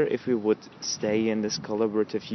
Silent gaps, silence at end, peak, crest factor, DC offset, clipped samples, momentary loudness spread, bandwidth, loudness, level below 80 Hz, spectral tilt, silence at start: none; 0 s; -12 dBFS; 16 dB; under 0.1%; under 0.1%; 3 LU; 6.2 kHz; -27 LUFS; -68 dBFS; -4.5 dB/octave; 0 s